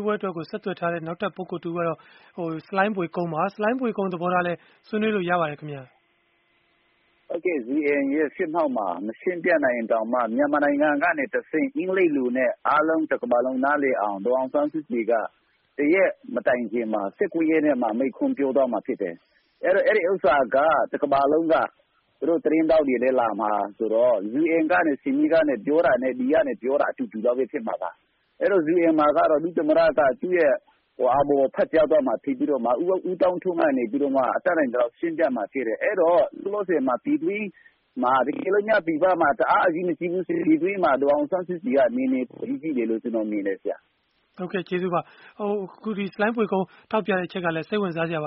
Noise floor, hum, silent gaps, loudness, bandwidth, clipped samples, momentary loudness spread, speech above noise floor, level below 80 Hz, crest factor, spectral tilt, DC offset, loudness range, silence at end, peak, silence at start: -66 dBFS; none; none; -23 LUFS; 5.4 kHz; under 0.1%; 9 LU; 44 dB; -62 dBFS; 18 dB; -5 dB/octave; under 0.1%; 6 LU; 0 s; -6 dBFS; 0 s